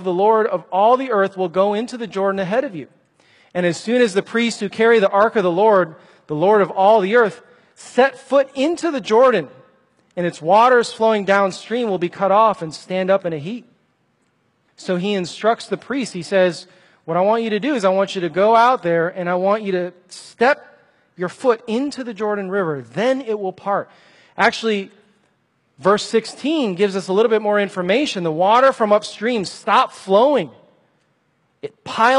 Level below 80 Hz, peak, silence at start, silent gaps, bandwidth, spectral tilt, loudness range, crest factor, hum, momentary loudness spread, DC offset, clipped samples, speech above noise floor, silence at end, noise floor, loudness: -68 dBFS; 0 dBFS; 0 s; none; 11.5 kHz; -5 dB/octave; 5 LU; 18 dB; none; 12 LU; under 0.1%; under 0.1%; 47 dB; 0 s; -64 dBFS; -18 LUFS